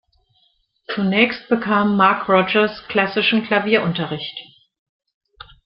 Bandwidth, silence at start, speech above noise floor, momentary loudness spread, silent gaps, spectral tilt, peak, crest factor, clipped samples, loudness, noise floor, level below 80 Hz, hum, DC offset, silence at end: 5.6 kHz; 0.9 s; 45 dB; 11 LU; none; -9 dB/octave; -2 dBFS; 18 dB; under 0.1%; -18 LUFS; -63 dBFS; -58 dBFS; none; under 0.1%; 1.2 s